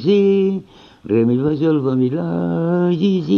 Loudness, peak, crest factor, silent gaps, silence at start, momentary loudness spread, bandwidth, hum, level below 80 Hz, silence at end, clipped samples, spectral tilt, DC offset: -17 LUFS; -4 dBFS; 12 dB; none; 0 s; 6 LU; 6.6 kHz; none; -54 dBFS; 0 s; under 0.1%; -9.5 dB/octave; under 0.1%